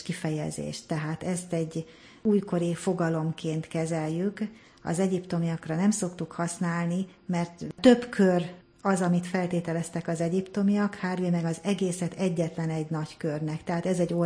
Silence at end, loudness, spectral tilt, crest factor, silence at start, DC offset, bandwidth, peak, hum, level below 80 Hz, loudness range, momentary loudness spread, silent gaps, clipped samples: 0 s; -28 LUFS; -6.5 dB/octave; 20 dB; 0 s; under 0.1%; 10.5 kHz; -6 dBFS; none; -64 dBFS; 4 LU; 9 LU; none; under 0.1%